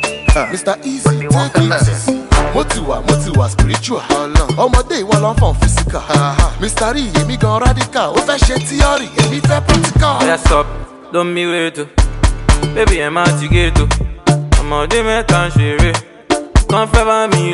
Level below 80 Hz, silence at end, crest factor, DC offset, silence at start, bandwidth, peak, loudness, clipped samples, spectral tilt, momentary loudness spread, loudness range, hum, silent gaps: -18 dBFS; 0 s; 12 dB; under 0.1%; 0 s; 11.5 kHz; 0 dBFS; -14 LUFS; under 0.1%; -5 dB/octave; 5 LU; 1 LU; none; none